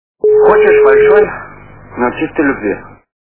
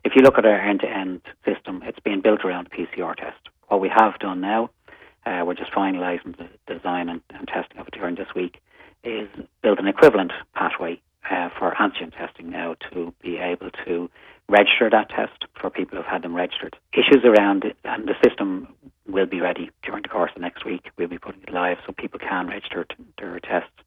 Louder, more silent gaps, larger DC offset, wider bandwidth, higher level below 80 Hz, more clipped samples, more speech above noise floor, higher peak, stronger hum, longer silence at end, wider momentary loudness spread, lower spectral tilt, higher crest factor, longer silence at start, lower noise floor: first, -10 LUFS vs -22 LUFS; neither; first, 0.7% vs under 0.1%; second, 4 kHz vs 11.5 kHz; first, -42 dBFS vs -58 dBFS; first, 0.3% vs under 0.1%; first, 25 dB vs 19 dB; about the same, 0 dBFS vs -2 dBFS; first, 50 Hz at -40 dBFS vs none; first, 0.45 s vs 0.2 s; about the same, 15 LU vs 17 LU; first, -10 dB/octave vs -6 dB/octave; second, 12 dB vs 20 dB; first, 0.25 s vs 0.05 s; second, -35 dBFS vs -41 dBFS